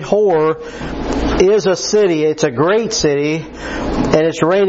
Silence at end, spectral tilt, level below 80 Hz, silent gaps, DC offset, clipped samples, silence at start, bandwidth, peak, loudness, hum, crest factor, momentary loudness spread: 0 s; -5 dB/octave; -32 dBFS; none; under 0.1%; under 0.1%; 0 s; 8 kHz; 0 dBFS; -15 LUFS; none; 14 dB; 10 LU